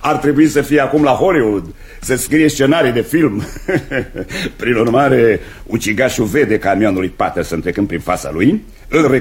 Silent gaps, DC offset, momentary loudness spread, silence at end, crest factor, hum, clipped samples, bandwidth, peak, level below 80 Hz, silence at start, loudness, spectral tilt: none; under 0.1%; 10 LU; 0 s; 14 dB; none; under 0.1%; 16.5 kHz; 0 dBFS; -36 dBFS; 0 s; -14 LUFS; -5.5 dB/octave